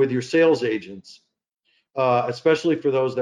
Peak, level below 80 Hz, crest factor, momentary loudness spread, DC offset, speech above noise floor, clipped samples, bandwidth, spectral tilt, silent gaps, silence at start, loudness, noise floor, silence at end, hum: -8 dBFS; -70 dBFS; 14 dB; 15 LU; under 0.1%; 50 dB; under 0.1%; 10 kHz; -6 dB/octave; none; 0 s; -21 LUFS; -71 dBFS; 0 s; none